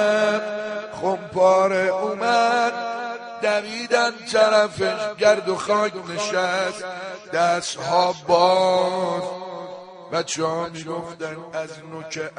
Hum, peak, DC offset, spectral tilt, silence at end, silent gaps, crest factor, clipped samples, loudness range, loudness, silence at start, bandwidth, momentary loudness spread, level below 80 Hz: none; -4 dBFS; under 0.1%; -3.5 dB/octave; 0.1 s; none; 18 dB; under 0.1%; 3 LU; -21 LUFS; 0 s; 10 kHz; 14 LU; -66 dBFS